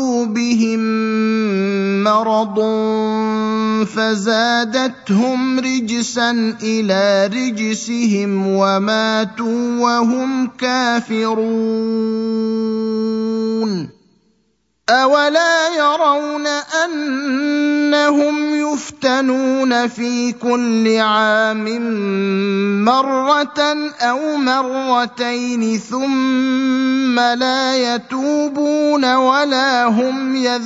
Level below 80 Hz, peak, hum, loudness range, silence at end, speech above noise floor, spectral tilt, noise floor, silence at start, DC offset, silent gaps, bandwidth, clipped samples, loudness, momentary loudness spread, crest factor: -66 dBFS; 0 dBFS; none; 2 LU; 0 s; 48 dB; -4.5 dB/octave; -64 dBFS; 0 s; under 0.1%; none; 8 kHz; under 0.1%; -16 LUFS; 6 LU; 16 dB